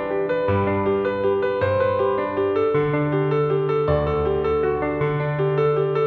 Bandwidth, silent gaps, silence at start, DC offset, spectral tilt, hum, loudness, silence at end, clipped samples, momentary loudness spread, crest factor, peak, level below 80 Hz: 4.6 kHz; none; 0 s; under 0.1%; -9.5 dB/octave; none; -21 LUFS; 0 s; under 0.1%; 2 LU; 12 dB; -8 dBFS; -42 dBFS